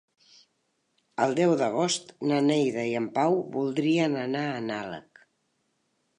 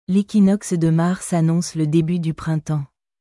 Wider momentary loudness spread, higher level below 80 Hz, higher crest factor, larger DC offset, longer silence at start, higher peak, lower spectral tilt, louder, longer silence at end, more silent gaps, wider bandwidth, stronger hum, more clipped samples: about the same, 9 LU vs 8 LU; second, -76 dBFS vs -52 dBFS; first, 18 dB vs 12 dB; neither; first, 1.2 s vs 0.1 s; about the same, -10 dBFS vs -8 dBFS; second, -5 dB/octave vs -7 dB/octave; second, -26 LUFS vs -19 LUFS; first, 1.2 s vs 0.35 s; neither; about the same, 11 kHz vs 12 kHz; neither; neither